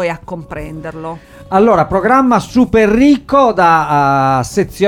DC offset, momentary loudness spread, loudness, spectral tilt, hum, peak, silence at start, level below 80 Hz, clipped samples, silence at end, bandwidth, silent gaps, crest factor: under 0.1%; 17 LU; -11 LUFS; -6.5 dB/octave; none; 0 dBFS; 0 s; -36 dBFS; under 0.1%; 0 s; 16 kHz; none; 12 dB